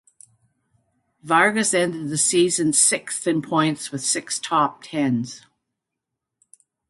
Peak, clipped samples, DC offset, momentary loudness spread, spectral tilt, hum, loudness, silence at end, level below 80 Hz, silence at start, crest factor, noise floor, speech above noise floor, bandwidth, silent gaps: -2 dBFS; under 0.1%; under 0.1%; 8 LU; -3 dB/octave; none; -20 LUFS; 1.5 s; -68 dBFS; 1.25 s; 20 dB; -83 dBFS; 62 dB; 11.5 kHz; none